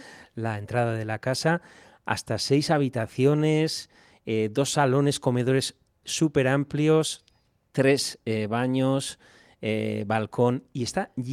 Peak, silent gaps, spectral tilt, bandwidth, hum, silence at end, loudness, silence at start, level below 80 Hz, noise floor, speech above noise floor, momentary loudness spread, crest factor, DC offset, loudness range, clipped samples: -6 dBFS; none; -5.5 dB/octave; 15.5 kHz; none; 0 s; -26 LUFS; 0 s; -62 dBFS; -66 dBFS; 41 dB; 11 LU; 18 dB; under 0.1%; 3 LU; under 0.1%